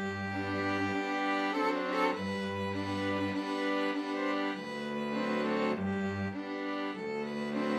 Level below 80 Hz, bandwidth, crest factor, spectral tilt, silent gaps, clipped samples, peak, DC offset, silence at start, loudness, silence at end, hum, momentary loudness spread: -74 dBFS; 12.5 kHz; 16 dB; -6 dB/octave; none; under 0.1%; -18 dBFS; under 0.1%; 0 s; -33 LUFS; 0 s; none; 5 LU